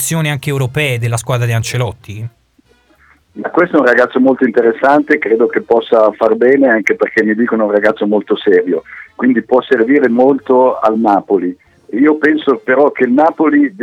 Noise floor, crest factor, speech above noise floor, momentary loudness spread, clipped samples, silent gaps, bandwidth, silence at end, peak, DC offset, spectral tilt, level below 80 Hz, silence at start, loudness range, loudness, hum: -52 dBFS; 12 dB; 41 dB; 8 LU; 0.2%; none; 16.5 kHz; 0 s; 0 dBFS; under 0.1%; -6 dB/octave; -52 dBFS; 0 s; 5 LU; -12 LUFS; none